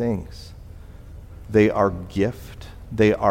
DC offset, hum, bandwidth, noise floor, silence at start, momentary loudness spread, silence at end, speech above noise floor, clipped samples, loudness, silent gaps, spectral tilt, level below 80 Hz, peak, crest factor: under 0.1%; none; 16 kHz; -40 dBFS; 0 s; 24 LU; 0 s; 20 dB; under 0.1%; -22 LUFS; none; -7.5 dB/octave; -42 dBFS; -4 dBFS; 18 dB